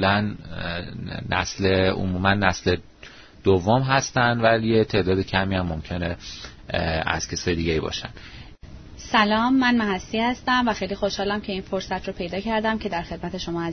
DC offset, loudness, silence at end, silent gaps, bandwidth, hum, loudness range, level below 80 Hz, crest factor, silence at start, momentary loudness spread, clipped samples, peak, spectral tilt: under 0.1%; -23 LUFS; 0 s; none; 6.6 kHz; none; 5 LU; -42 dBFS; 22 dB; 0 s; 12 LU; under 0.1%; -2 dBFS; -5 dB/octave